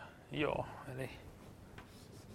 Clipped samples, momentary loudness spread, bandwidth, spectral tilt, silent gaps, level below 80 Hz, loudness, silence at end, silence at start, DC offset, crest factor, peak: under 0.1%; 18 LU; 16.5 kHz; -6 dB/octave; none; -62 dBFS; -41 LUFS; 0 s; 0 s; under 0.1%; 24 dB; -22 dBFS